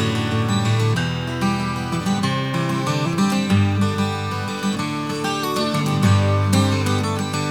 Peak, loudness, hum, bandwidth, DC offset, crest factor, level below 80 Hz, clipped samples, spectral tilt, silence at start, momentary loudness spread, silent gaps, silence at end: -2 dBFS; -20 LUFS; none; 16.5 kHz; 0.2%; 16 dB; -50 dBFS; under 0.1%; -5.5 dB/octave; 0 s; 6 LU; none; 0 s